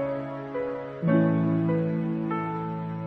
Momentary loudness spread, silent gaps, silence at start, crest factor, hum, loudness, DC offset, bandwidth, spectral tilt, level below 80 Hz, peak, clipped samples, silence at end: 10 LU; none; 0 s; 16 dB; none; -27 LUFS; under 0.1%; 4.2 kHz; -11 dB/octave; -62 dBFS; -10 dBFS; under 0.1%; 0 s